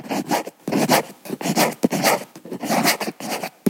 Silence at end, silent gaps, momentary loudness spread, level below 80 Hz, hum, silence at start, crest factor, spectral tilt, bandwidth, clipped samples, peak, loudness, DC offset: 0 s; none; 10 LU; -70 dBFS; none; 0 s; 20 dB; -3.5 dB/octave; 17 kHz; under 0.1%; -2 dBFS; -21 LUFS; under 0.1%